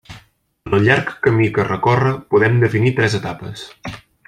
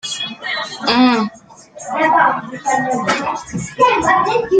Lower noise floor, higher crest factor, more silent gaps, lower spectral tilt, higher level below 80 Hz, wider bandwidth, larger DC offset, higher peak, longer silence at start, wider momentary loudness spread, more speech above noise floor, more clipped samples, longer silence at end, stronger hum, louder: first, -49 dBFS vs -40 dBFS; about the same, 16 dB vs 16 dB; neither; first, -7 dB/octave vs -3.5 dB/octave; about the same, -48 dBFS vs -50 dBFS; first, 10.5 kHz vs 9.4 kHz; neither; about the same, 0 dBFS vs 0 dBFS; about the same, 0.1 s vs 0.05 s; first, 17 LU vs 12 LU; first, 33 dB vs 25 dB; neither; first, 0.3 s vs 0 s; neither; about the same, -16 LUFS vs -16 LUFS